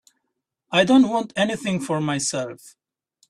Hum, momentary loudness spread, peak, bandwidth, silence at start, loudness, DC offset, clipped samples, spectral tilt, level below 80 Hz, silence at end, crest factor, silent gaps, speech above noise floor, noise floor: none; 9 LU; -4 dBFS; 12.5 kHz; 0.7 s; -21 LUFS; under 0.1%; under 0.1%; -4.5 dB/octave; -62 dBFS; 0.6 s; 18 dB; none; 58 dB; -79 dBFS